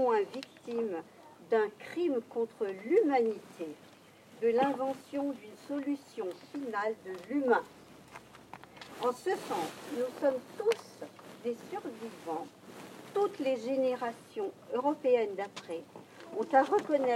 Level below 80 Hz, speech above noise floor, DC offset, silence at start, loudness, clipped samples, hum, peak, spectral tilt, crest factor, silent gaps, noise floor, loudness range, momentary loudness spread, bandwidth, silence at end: -82 dBFS; 24 dB; under 0.1%; 0 s; -33 LUFS; under 0.1%; none; -12 dBFS; -5 dB/octave; 22 dB; none; -56 dBFS; 4 LU; 20 LU; 15.5 kHz; 0 s